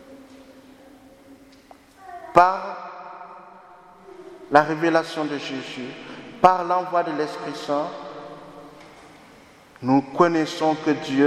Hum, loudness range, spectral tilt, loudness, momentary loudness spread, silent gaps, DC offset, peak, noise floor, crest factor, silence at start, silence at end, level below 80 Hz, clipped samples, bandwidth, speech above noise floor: none; 4 LU; -5.5 dB/octave; -22 LUFS; 24 LU; none; under 0.1%; 0 dBFS; -50 dBFS; 24 dB; 0.1 s; 0 s; -60 dBFS; under 0.1%; 13.5 kHz; 29 dB